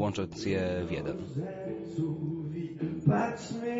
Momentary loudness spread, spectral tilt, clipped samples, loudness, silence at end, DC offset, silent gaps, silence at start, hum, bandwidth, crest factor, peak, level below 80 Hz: 9 LU; -7 dB/octave; under 0.1%; -33 LUFS; 0 s; under 0.1%; none; 0 s; none; 8 kHz; 20 dB; -12 dBFS; -60 dBFS